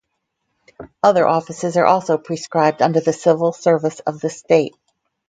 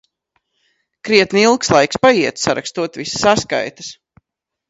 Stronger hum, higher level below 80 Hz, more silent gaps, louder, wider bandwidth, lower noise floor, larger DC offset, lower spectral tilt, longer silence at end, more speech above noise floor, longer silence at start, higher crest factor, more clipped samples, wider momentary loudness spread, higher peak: neither; second, -62 dBFS vs -50 dBFS; neither; about the same, -17 LUFS vs -15 LUFS; first, 9.2 kHz vs 8 kHz; second, -74 dBFS vs -79 dBFS; neither; first, -6 dB/octave vs -3.5 dB/octave; second, 0.6 s vs 0.75 s; second, 58 dB vs 64 dB; second, 0.8 s vs 1.05 s; about the same, 18 dB vs 18 dB; neither; second, 8 LU vs 14 LU; about the same, 0 dBFS vs 0 dBFS